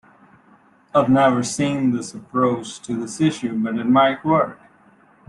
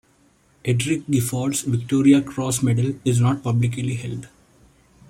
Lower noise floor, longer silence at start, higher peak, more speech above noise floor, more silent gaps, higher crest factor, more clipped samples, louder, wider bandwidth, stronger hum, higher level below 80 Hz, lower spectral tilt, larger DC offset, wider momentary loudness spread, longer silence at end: second, -54 dBFS vs -58 dBFS; first, 0.95 s vs 0.65 s; about the same, -4 dBFS vs -4 dBFS; about the same, 35 dB vs 38 dB; neither; about the same, 18 dB vs 18 dB; neither; about the same, -20 LUFS vs -21 LUFS; second, 11.5 kHz vs 16 kHz; neither; about the same, -58 dBFS vs -54 dBFS; about the same, -5.5 dB/octave vs -6 dB/octave; neither; about the same, 11 LU vs 11 LU; about the same, 0.75 s vs 0.8 s